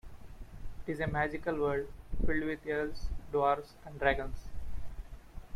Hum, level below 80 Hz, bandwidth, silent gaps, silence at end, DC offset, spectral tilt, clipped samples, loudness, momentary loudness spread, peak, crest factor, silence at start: none; -42 dBFS; 12.5 kHz; none; 0 s; under 0.1%; -7 dB/octave; under 0.1%; -34 LUFS; 20 LU; -14 dBFS; 18 dB; 0.05 s